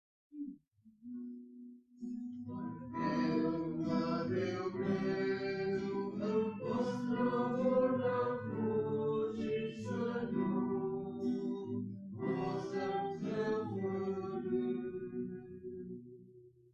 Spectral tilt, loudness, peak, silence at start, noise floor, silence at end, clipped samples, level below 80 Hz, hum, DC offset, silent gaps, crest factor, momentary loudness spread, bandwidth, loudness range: -8 dB/octave; -37 LUFS; -22 dBFS; 0.3 s; -64 dBFS; 0.25 s; under 0.1%; -70 dBFS; none; under 0.1%; none; 16 dB; 14 LU; 7.6 kHz; 5 LU